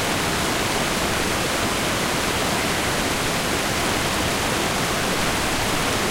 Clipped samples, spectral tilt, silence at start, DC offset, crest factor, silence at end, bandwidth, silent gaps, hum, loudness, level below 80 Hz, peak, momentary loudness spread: under 0.1%; -3 dB/octave; 0 s; under 0.1%; 14 dB; 0 s; 16 kHz; none; none; -21 LUFS; -38 dBFS; -8 dBFS; 0 LU